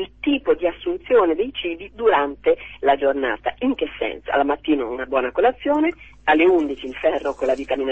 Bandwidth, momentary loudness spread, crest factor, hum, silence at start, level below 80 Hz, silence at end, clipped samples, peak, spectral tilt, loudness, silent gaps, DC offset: 8.2 kHz; 7 LU; 16 dB; none; 0 s; -48 dBFS; 0 s; under 0.1%; -4 dBFS; -5.5 dB/octave; -21 LUFS; none; 0.2%